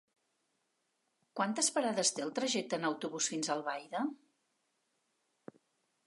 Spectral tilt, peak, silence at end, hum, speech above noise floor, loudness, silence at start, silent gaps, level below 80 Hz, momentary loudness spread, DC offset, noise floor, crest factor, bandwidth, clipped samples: -2 dB/octave; -16 dBFS; 1.9 s; none; 46 dB; -34 LUFS; 1.35 s; none; under -90 dBFS; 8 LU; under 0.1%; -81 dBFS; 22 dB; 11.5 kHz; under 0.1%